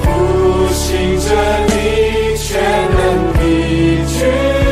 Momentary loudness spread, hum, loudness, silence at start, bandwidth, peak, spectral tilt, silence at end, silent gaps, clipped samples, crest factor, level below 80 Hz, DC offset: 2 LU; none; -13 LUFS; 0 s; 16 kHz; -2 dBFS; -5.5 dB/octave; 0 s; none; under 0.1%; 12 dB; -20 dBFS; under 0.1%